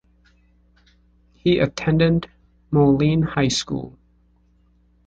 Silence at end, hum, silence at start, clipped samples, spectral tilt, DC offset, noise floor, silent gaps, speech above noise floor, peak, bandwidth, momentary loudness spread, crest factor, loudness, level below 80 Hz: 1.2 s; 60 Hz at -40 dBFS; 1.45 s; under 0.1%; -6 dB/octave; under 0.1%; -58 dBFS; none; 40 dB; -4 dBFS; 9 kHz; 13 LU; 18 dB; -20 LUFS; -46 dBFS